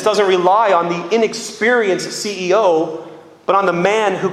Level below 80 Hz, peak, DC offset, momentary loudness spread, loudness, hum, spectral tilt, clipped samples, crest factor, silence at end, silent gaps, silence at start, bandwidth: -64 dBFS; 0 dBFS; under 0.1%; 9 LU; -15 LUFS; none; -4 dB/octave; under 0.1%; 16 dB; 0 s; none; 0 s; 13.5 kHz